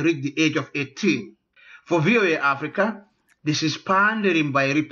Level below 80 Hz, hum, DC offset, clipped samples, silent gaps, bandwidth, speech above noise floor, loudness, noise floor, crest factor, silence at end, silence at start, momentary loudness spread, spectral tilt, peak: -70 dBFS; none; under 0.1%; under 0.1%; none; 7.2 kHz; 29 dB; -22 LUFS; -50 dBFS; 14 dB; 0.05 s; 0 s; 8 LU; -5 dB/octave; -8 dBFS